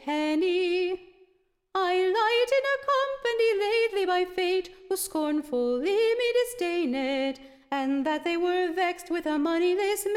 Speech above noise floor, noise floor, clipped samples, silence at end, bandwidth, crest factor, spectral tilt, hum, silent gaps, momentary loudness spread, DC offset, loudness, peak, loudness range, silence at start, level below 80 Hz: 41 dB; -68 dBFS; under 0.1%; 0 s; 16.5 kHz; 14 dB; -2 dB/octave; none; none; 7 LU; under 0.1%; -26 LUFS; -12 dBFS; 2 LU; 0 s; -62 dBFS